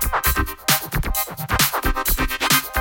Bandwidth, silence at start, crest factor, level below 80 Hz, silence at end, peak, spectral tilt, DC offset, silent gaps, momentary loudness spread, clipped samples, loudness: over 20 kHz; 0 s; 18 dB; -28 dBFS; 0 s; -2 dBFS; -2.5 dB/octave; under 0.1%; none; 6 LU; under 0.1%; -20 LUFS